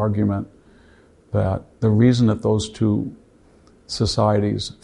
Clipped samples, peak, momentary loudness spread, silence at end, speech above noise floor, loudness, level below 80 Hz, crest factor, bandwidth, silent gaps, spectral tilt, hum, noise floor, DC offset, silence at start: under 0.1%; -4 dBFS; 12 LU; 0.1 s; 33 dB; -20 LUFS; -44 dBFS; 18 dB; 11 kHz; none; -7 dB/octave; none; -52 dBFS; under 0.1%; 0 s